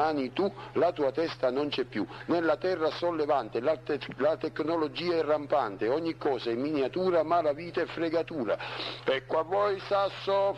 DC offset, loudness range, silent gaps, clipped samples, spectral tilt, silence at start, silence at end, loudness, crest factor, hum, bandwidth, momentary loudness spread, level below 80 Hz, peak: under 0.1%; 1 LU; none; under 0.1%; -6.5 dB/octave; 0 s; 0 s; -29 LUFS; 14 dB; none; 9.8 kHz; 5 LU; -64 dBFS; -14 dBFS